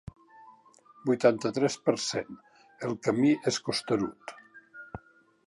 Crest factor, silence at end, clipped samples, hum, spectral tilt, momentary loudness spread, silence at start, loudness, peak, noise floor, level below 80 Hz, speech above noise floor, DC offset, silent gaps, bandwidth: 20 dB; 0.5 s; under 0.1%; none; -4.5 dB/octave; 22 LU; 0.45 s; -28 LUFS; -10 dBFS; -58 dBFS; -64 dBFS; 30 dB; under 0.1%; none; 11.5 kHz